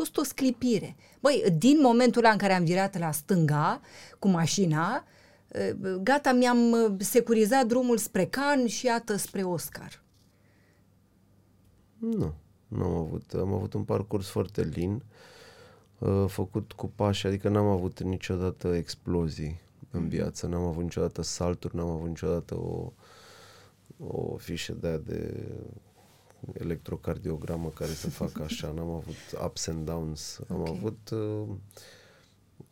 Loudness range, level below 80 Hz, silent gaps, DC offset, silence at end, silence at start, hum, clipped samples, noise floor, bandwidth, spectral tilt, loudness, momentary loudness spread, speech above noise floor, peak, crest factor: 12 LU; -52 dBFS; none; under 0.1%; 0.8 s; 0 s; none; under 0.1%; -63 dBFS; 17 kHz; -5.5 dB/octave; -29 LUFS; 15 LU; 35 dB; -8 dBFS; 22 dB